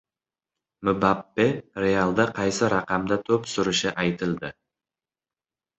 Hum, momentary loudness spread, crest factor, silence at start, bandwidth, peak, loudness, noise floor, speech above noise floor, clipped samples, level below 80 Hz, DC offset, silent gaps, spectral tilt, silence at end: none; 6 LU; 22 dB; 0.8 s; 8.4 kHz; -4 dBFS; -24 LUFS; under -90 dBFS; over 66 dB; under 0.1%; -54 dBFS; under 0.1%; none; -5 dB/octave; 1.3 s